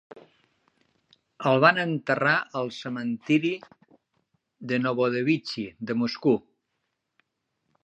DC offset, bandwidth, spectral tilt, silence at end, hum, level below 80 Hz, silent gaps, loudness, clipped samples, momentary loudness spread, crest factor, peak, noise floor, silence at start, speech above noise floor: under 0.1%; 8.6 kHz; -6.5 dB/octave; 1.45 s; none; -74 dBFS; none; -25 LUFS; under 0.1%; 12 LU; 24 dB; -2 dBFS; -79 dBFS; 0.15 s; 54 dB